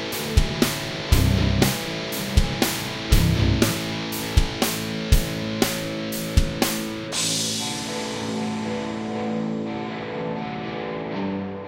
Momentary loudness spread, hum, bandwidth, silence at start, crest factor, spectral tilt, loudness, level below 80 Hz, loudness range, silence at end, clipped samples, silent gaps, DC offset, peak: 8 LU; none; 16.5 kHz; 0 s; 22 dB; -4.5 dB/octave; -24 LUFS; -28 dBFS; 6 LU; 0 s; under 0.1%; none; under 0.1%; -2 dBFS